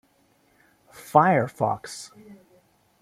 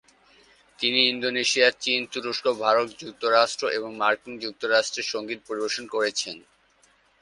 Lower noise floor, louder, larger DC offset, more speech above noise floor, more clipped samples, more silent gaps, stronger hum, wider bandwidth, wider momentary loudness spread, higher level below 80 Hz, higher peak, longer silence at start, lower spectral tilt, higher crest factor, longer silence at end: about the same, -63 dBFS vs -62 dBFS; about the same, -22 LUFS vs -24 LUFS; neither; first, 41 dB vs 37 dB; neither; neither; neither; first, 16 kHz vs 11.5 kHz; first, 23 LU vs 11 LU; first, -66 dBFS vs -72 dBFS; about the same, -2 dBFS vs -4 dBFS; first, 1.1 s vs 0.8 s; first, -6 dB/octave vs -1.5 dB/octave; about the same, 24 dB vs 22 dB; about the same, 0.7 s vs 0.8 s